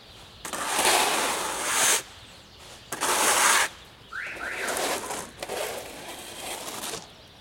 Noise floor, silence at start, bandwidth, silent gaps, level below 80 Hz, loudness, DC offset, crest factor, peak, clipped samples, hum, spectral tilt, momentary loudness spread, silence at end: -48 dBFS; 0 s; 16.5 kHz; none; -60 dBFS; -25 LUFS; under 0.1%; 22 dB; -6 dBFS; under 0.1%; none; 0 dB/octave; 20 LU; 0 s